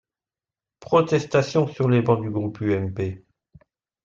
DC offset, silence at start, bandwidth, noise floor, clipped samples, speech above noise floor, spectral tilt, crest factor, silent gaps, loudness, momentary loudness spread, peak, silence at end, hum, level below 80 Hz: under 0.1%; 0.8 s; 7.6 kHz; under -90 dBFS; under 0.1%; over 69 dB; -7.5 dB/octave; 18 dB; none; -22 LUFS; 9 LU; -4 dBFS; 0.85 s; none; -60 dBFS